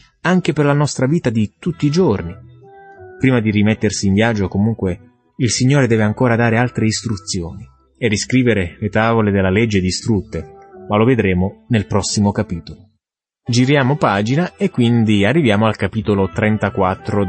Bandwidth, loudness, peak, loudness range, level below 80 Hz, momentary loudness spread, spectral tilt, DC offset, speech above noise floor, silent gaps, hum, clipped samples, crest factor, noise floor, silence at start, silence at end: 8.8 kHz; -16 LUFS; -2 dBFS; 2 LU; -44 dBFS; 8 LU; -6 dB/octave; under 0.1%; 59 dB; none; none; under 0.1%; 14 dB; -74 dBFS; 0.25 s; 0 s